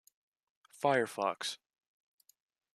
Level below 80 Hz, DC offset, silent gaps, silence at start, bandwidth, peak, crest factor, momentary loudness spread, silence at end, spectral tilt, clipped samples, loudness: -86 dBFS; under 0.1%; none; 0.8 s; 14.5 kHz; -14 dBFS; 24 dB; 9 LU; 1.2 s; -3.5 dB/octave; under 0.1%; -34 LUFS